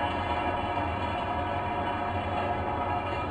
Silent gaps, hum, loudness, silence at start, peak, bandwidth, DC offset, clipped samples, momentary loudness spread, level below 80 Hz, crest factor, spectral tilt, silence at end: none; none; -30 LUFS; 0 s; -16 dBFS; 9.2 kHz; under 0.1%; under 0.1%; 1 LU; -44 dBFS; 14 dB; -7 dB/octave; 0 s